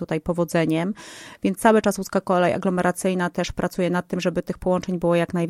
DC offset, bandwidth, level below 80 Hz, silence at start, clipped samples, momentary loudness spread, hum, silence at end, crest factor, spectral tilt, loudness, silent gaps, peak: under 0.1%; 15.5 kHz; -48 dBFS; 0 s; under 0.1%; 7 LU; none; 0 s; 18 dB; -6 dB/octave; -22 LUFS; none; -4 dBFS